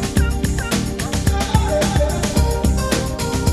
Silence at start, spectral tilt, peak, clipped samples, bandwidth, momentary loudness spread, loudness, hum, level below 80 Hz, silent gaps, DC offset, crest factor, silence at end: 0 s; -5 dB/octave; -2 dBFS; under 0.1%; 13 kHz; 3 LU; -19 LUFS; none; -22 dBFS; none; under 0.1%; 16 dB; 0 s